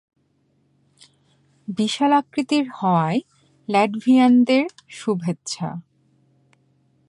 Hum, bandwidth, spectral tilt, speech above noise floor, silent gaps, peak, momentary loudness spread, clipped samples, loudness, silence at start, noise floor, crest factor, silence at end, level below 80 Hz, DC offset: none; 11 kHz; -5.5 dB/octave; 45 dB; none; -6 dBFS; 16 LU; under 0.1%; -20 LUFS; 1.7 s; -65 dBFS; 16 dB; 1.3 s; -70 dBFS; under 0.1%